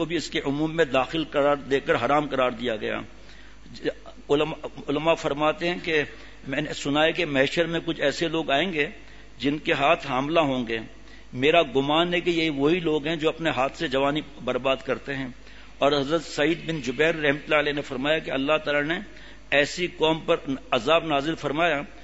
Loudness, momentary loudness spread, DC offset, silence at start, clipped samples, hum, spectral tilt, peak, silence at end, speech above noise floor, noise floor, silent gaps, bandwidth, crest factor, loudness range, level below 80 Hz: -24 LUFS; 8 LU; 0.6%; 0 s; under 0.1%; none; -5 dB/octave; -4 dBFS; 0 s; 23 dB; -47 dBFS; none; 8 kHz; 20 dB; 3 LU; -50 dBFS